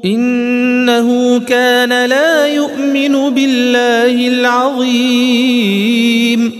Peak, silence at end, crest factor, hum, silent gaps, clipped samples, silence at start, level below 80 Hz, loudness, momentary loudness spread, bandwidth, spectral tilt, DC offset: 0 dBFS; 0 s; 10 dB; none; none; under 0.1%; 0 s; -64 dBFS; -11 LUFS; 3 LU; 15 kHz; -4 dB/octave; under 0.1%